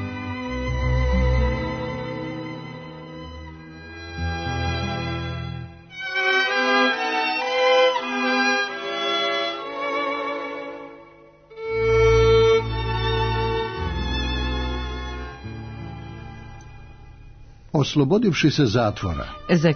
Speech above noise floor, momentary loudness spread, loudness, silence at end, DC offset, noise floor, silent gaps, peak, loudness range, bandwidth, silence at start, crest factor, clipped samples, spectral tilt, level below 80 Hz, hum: 29 dB; 19 LU; -22 LUFS; 0 s; under 0.1%; -48 dBFS; none; -6 dBFS; 10 LU; 6.6 kHz; 0 s; 16 dB; under 0.1%; -5.5 dB/octave; -32 dBFS; none